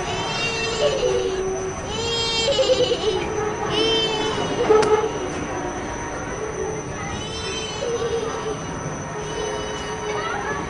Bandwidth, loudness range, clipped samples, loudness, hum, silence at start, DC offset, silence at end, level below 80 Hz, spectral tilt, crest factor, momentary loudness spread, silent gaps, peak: 11 kHz; 7 LU; under 0.1%; -23 LUFS; none; 0 s; under 0.1%; 0 s; -42 dBFS; -3.5 dB/octave; 20 dB; 10 LU; none; -4 dBFS